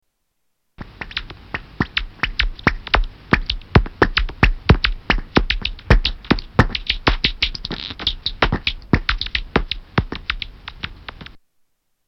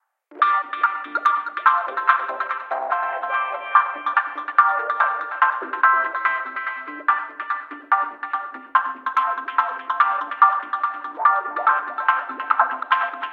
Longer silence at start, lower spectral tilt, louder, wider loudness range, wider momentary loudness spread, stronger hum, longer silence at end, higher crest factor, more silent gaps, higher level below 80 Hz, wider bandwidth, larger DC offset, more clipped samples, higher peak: first, 0.8 s vs 0.3 s; first, -6 dB/octave vs -2 dB/octave; about the same, -20 LUFS vs -21 LUFS; about the same, 5 LU vs 3 LU; first, 14 LU vs 9 LU; neither; first, 0.7 s vs 0 s; about the same, 20 dB vs 20 dB; neither; first, -26 dBFS vs -86 dBFS; about the same, 6.6 kHz vs 6.6 kHz; neither; neither; about the same, 0 dBFS vs -2 dBFS